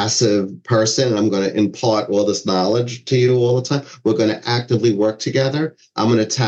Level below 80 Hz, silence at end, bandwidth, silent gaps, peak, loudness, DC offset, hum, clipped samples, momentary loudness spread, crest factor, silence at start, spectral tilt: -64 dBFS; 0 s; 8.4 kHz; none; -4 dBFS; -18 LUFS; under 0.1%; none; under 0.1%; 5 LU; 14 dB; 0 s; -5 dB/octave